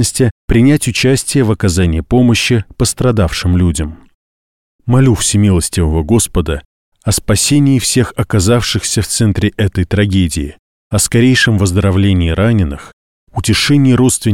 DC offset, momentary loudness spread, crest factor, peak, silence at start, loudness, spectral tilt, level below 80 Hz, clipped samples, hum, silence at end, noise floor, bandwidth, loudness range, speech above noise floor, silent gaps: 0.7%; 8 LU; 12 dB; 0 dBFS; 0 s; -12 LUFS; -5 dB/octave; -26 dBFS; under 0.1%; none; 0 s; under -90 dBFS; 17 kHz; 2 LU; over 79 dB; 0.31-0.48 s, 4.14-4.79 s, 6.65-6.92 s, 10.59-10.91 s, 12.93-13.27 s